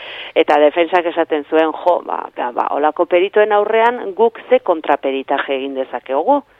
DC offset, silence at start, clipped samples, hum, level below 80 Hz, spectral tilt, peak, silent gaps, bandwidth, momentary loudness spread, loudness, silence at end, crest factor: under 0.1%; 0 s; under 0.1%; none; -66 dBFS; -5.5 dB/octave; 0 dBFS; none; 6 kHz; 8 LU; -16 LUFS; 0.2 s; 16 dB